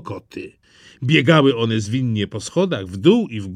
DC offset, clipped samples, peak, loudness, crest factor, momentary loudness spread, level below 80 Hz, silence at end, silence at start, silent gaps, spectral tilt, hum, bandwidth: under 0.1%; under 0.1%; 0 dBFS; -18 LUFS; 18 dB; 18 LU; -58 dBFS; 0 s; 0.05 s; none; -6 dB/octave; none; 11 kHz